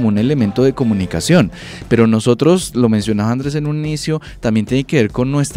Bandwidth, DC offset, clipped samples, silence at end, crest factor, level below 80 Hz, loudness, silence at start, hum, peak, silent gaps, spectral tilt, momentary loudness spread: 15.5 kHz; under 0.1%; under 0.1%; 0 s; 14 dB; -38 dBFS; -15 LUFS; 0 s; none; -2 dBFS; none; -6.5 dB/octave; 7 LU